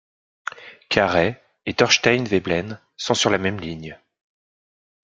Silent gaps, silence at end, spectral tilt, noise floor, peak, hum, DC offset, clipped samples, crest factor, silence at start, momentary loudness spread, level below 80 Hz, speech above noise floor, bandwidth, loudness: none; 1.25 s; -3.5 dB/octave; under -90 dBFS; 0 dBFS; none; under 0.1%; under 0.1%; 22 dB; 0.55 s; 18 LU; -56 dBFS; over 70 dB; 9.4 kHz; -20 LUFS